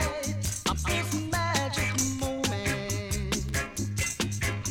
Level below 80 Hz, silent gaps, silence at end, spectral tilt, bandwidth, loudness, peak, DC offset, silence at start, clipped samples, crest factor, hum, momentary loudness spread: -40 dBFS; none; 0 s; -3.5 dB/octave; 19 kHz; -29 LUFS; -14 dBFS; under 0.1%; 0 s; under 0.1%; 16 dB; none; 4 LU